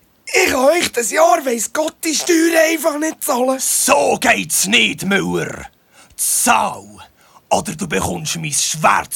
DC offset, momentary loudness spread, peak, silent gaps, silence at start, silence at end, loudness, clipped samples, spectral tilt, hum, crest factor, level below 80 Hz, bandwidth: under 0.1%; 8 LU; 0 dBFS; none; 0.25 s; 0 s; -15 LUFS; under 0.1%; -2.5 dB/octave; none; 16 dB; -50 dBFS; 18 kHz